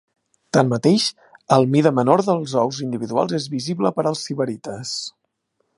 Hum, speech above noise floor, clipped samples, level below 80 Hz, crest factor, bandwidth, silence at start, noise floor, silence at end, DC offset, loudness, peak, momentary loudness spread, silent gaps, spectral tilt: none; 52 dB; under 0.1%; -64 dBFS; 20 dB; 11.5 kHz; 0.55 s; -71 dBFS; 0.7 s; under 0.1%; -20 LUFS; 0 dBFS; 10 LU; none; -5.5 dB/octave